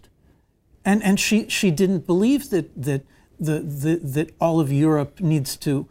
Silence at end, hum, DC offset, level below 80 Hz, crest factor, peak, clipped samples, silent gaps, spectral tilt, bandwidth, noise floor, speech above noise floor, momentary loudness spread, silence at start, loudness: 0.05 s; none; under 0.1%; -52 dBFS; 14 dB; -6 dBFS; under 0.1%; none; -5.5 dB/octave; 16 kHz; -59 dBFS; 38 dB; 7 LU; 0.85 s; -21 LUFS